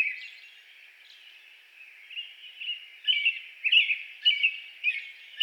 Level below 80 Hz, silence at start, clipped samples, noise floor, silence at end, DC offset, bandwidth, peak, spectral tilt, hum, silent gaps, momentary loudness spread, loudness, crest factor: under -90 dBFS; 0 s; under 0.1%; -53 dBFS; 0 s; under 0.1%; 18 kHz; -10 dBFS; 7.5 dB/octave; none; none; 20 LU; -25 LUFS; 20 dB